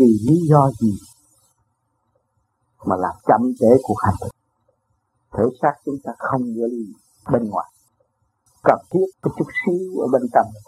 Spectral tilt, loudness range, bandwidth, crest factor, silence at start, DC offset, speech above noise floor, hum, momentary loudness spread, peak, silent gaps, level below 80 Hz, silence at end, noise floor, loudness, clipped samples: -9 dB/octave; 4 LU; 13.5 kHz; 20 dB; 0 s; under 0.1%; 51 dB; none; 15 LU; 0 dBFS; none; -52 dBFS; 0.1 s; -69 dBFS; -19 LUFS; under 0.1%